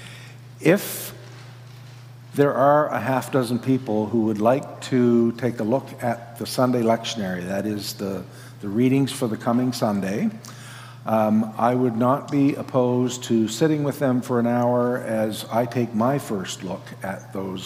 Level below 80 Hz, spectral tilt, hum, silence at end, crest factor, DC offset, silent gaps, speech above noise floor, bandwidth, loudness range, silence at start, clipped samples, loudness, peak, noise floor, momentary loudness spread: -66 dBFS; -6 dB/octave; none; 0 s; 18 dB; under 0.1%; none; 20 dB; 16 kHz; 3 LU; 0 s; under 0.1%; -22 LUFS; -4 dBFS; -42 dBFS; 15 LU